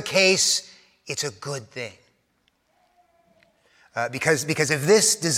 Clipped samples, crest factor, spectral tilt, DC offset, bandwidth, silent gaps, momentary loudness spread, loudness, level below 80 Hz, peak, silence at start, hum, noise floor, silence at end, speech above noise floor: under 0.1%; 20 dB; -2.5 dB/octave; under 0.1%; 16.5 kHz; none; 17 LU; -21 LUFS; -70 dBFS; -4 dBFS; 0 s; none; -69 dBFS; 0 s; 46 dB